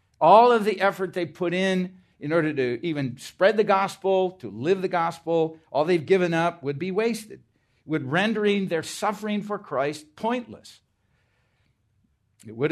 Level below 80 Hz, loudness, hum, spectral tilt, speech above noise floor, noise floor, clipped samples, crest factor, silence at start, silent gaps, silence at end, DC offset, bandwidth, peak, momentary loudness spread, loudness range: -72 dBFS; -24 LUFS; none; -6 dB/octave; 45 dB; -68 dBFS; under 0.1%; 22 dB; 0.2 s; none; 0 s; under 0.1%; 13.5 kHz; -4 dBFS; 11 LU; 7 LU